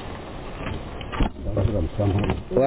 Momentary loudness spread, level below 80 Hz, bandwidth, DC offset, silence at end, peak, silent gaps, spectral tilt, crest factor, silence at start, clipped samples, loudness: 12 LU; -32 dBFS; 4 kHz; under 0.1%; 0 s; -8 dBFS; none; -11.5 dB/octave; 16 dB; 0 s; under 0.1%; -27 LUFS